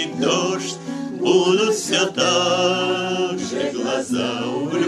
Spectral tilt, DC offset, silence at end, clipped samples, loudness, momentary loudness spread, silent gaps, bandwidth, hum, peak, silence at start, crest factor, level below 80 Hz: -3.5 dB/octave; under 0.1%; 0 s; under 0.1%; -20 LUFS; 7 LU; none; 13 kHz; none; -4 dBFS; 0 s; 16 dB; -64 dBFS